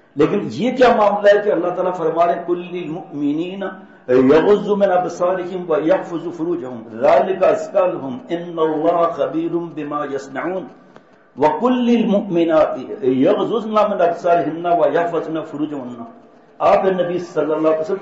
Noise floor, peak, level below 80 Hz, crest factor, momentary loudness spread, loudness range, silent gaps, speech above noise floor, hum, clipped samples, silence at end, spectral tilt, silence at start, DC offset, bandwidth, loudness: -47 dBFS; -4 dBFS; -58 dBFS; 14 dB; 12 LU; 3 LU; none; 30 dB; none; under 0.1%; 0 s; -7 dB/octave; 0.15 s; 0.1%; 8 kHz; -17 LUFS